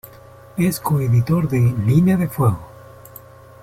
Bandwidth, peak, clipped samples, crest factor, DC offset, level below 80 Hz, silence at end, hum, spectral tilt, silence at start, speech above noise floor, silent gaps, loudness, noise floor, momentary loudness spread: 16 kHz; -4 dBFS; under 0.1%; 14 dB; under 0.1%; -46 dBFS; 0.95 s; none; -8 dB/octave; 0.55 s; 26 dB; none; -18 LUFS; -43 dBFS; 11 LU